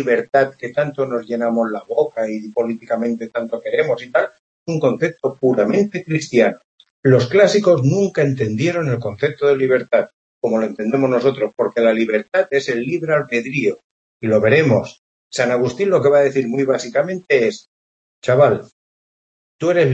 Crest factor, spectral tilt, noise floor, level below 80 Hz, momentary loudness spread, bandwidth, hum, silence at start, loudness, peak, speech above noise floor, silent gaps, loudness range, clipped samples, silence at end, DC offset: 16 dB; -6.5 dB/octave; under -90 dBFS; -62 dBFS; 9 LU; 8.4 kHz; none; 0 s; -18 LUFS; 0 dBFS; over 73 dB; 4.39-4.66 s, 6.64-6.78 s, 6.90-7.03 s, 10.14-10.41 s, 13.84-14.20 s, 14.99-15.30 s, 17.68-18.22 s, 18.72-19.59 s; 4 LU; under 0.1%; 0 s; under 0.1%